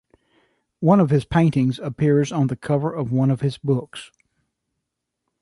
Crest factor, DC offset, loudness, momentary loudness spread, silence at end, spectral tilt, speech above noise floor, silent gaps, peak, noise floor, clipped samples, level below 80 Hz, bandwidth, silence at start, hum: 16 dB; under 0.1%; -20 LUFS; 7 LU; 1.35 s; -8 dB/octave; 60 dB; none; -4 dBFS; -80 dBFS; under 0.1%; -50 dBFS; 11.5 kHz; 0.8 s; none